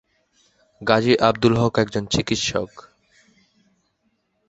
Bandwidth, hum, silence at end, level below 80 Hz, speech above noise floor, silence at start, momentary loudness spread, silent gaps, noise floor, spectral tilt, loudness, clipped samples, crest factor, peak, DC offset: 8.2 kHz; none; 1.7 s; -48 dBFS; 50 dB; 0.8 s; 11 LU; none; -69 dBFS; -5 dB/octave; -20 LUFS; under 0.1%; 22 dB; 0 dBFS; under 0.1%